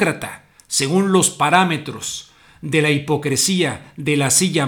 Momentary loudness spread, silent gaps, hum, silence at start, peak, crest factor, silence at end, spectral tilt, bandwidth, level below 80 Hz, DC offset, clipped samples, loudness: 12 LU; none; none; 0 s; 0 dBFS; 18 dB; 0 s; -3.5 dB/octave; 19.5 kHz; -56 dBFS; under 0.1%; under 0.1%; -17 LUFS